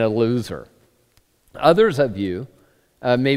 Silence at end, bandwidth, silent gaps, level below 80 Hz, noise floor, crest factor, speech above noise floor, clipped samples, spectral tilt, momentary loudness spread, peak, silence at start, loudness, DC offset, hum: 0 s; 15 kHz; none; -52 dBFS; -60 dBFS; 20 dB; 42 dB; under 0.1%; -7 dB/octave; 17 LU; 0 dBFS; 0 s; -20 LUFS; under 0.1%; none